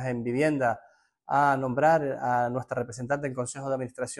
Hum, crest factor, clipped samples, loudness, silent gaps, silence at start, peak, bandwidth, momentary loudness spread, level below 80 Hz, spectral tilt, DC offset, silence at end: none; 16 dB; under 0.1%; -27 LUFS; none; 0 s; -10 dBFS; 12 kHz; 9 LU; -62 dBFS; -6 dB/octave; under 0.1%; 0.05 s